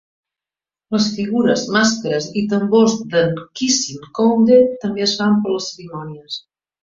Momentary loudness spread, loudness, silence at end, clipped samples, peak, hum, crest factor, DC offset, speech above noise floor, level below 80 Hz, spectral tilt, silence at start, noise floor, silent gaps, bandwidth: 16 LU; -17 LUFS; 0.45 s; under 0.1%; -2 dBFS; none; 16 dB; under 0.1%; 73 dB; -58 dBFS; -4 dB/octave; 0.9 s; -90 dBFS; none; 7.6 kHz